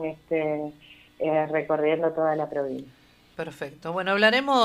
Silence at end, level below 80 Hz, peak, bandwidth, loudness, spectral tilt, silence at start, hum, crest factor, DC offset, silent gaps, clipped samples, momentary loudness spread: 0 s; -66 dBFS; -4 dBFS; 15 kHz; -25 LUFS; -5 dB/octave; 0 s; none; 22 dB; under 0.1%; none; under 0.1%; 17 LU